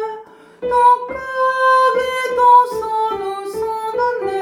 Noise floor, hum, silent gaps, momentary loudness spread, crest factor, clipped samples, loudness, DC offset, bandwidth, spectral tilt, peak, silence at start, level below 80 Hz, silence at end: -37 dBFS; none; none; 13 LU; 14 dB; under 0.1%; -16 LUFS; under 0.1%; 15.5 kHz; -3 dB/octave; -2 dBFS; 0 s; -54 dBFS; 0 s